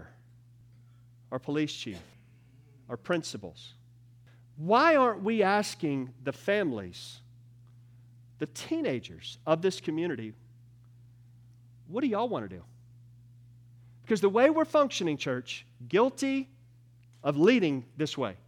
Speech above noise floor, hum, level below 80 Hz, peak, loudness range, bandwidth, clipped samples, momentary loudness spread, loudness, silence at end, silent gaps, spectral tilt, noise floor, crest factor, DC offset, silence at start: 29 dB; 60 Hz at -55 dBFS; -72 dBFS; -10 dBFS; 9 LU; 16.5 kHz; under 0.1%; 19 LU; -29 LUFS; 0.1 s; none; -5.5 dB/octave; -57 dBFS; 22 dB; under 0.1%; 0 s